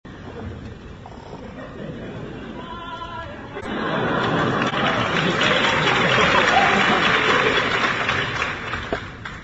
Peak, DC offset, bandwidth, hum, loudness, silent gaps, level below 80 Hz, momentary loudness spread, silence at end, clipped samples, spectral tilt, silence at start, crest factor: -4 dBFS; under 0.1%; 8.2 kHz; none; -19 LUFS; none; -44 dBFS; 20 LU; 0 s; under 0.1%; -4.5 dB/octave; 0.05 s; 18 dB